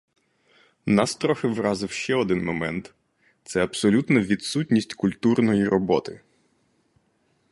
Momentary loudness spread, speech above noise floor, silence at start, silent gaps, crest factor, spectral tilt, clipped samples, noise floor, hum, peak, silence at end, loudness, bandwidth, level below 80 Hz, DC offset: 8 LU; 45 dB; 0.85 s; none; 20 dB; -5.5 dB/octave; under 0.1%; -67 dBFS; none; -4 dBFS; 1.35 s; -23 LUFS; 11.5 kHz; -56 dBFS; under 0.1%